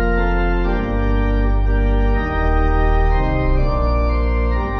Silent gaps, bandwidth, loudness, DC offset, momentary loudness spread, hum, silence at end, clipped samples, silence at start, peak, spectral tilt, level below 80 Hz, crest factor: none; 5.6 kHz; -19 LUFS; under 0.1%; 2 LU; none; 0 s; under 0.1%; 0 s; -6 dBFS; -9 dB/octave; -16 dBFS; 10 dB